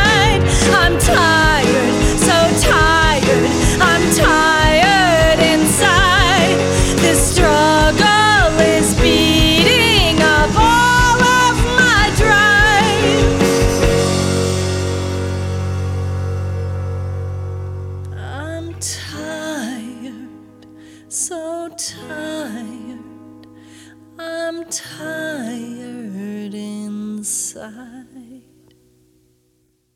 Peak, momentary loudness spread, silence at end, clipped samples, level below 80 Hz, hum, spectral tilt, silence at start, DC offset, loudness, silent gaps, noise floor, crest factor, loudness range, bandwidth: 0 dBFS; 17 LU; 1.6 s; under 0.1%; -26 dBFS; none; -4 dB/octave; 0 s; under 0.1%; -13 LUFS; none; -62 dBFS; 14 dB; 16 LU; 17 kHz